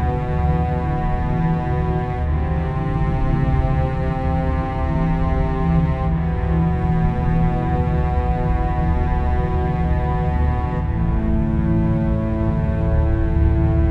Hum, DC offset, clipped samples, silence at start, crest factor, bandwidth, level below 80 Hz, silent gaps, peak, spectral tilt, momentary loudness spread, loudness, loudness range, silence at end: none; under 0.1%; under 0.1%; 0 s; 12 dB; 4.6 kHz; -22 dBFS; none; -6 dBFS; -10 dB/octave; 3 LU; -20 LUFS; 1 LU; 0 s